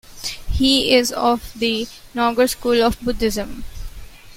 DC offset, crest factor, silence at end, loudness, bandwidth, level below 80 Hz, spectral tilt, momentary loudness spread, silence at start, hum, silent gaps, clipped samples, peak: under 0.1%; 18 dB; 0 s; -19 LUFS; 16.5 kHz; -34 dBFS; -3.5 dB/octave; 17 LU; 0.1 s; none; none; under 0.1%; -2 dBFS